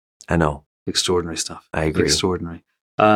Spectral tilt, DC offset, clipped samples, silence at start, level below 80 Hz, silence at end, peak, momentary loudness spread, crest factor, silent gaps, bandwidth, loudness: -4 dB/octave; under 0.1%; under 0.1%; 0.3 s; -40 dBFS; 0 s; -2 dBFS; 14 LU; 20 dB; 0.66-0.86 s, 2.81-2.98 s; 17 kHz; -21 LUFS